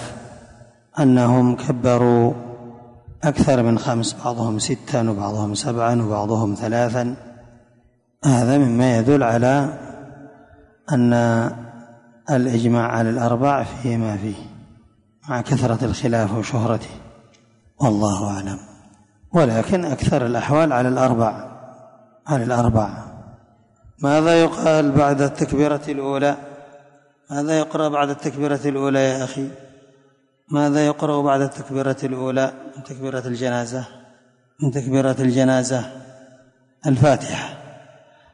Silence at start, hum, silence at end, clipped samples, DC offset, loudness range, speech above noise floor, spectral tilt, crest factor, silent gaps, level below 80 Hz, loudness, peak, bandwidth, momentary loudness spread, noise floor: 0 s; none; 0.55 s; under 0.1%; under 0.1%; 4 LU; 40 dB; -6.5 dB/octave; 18 dB; none; -46 dBFS; -19 LUFS; -4 dBFS; 11 kHz; 16 LU; -59 dBFS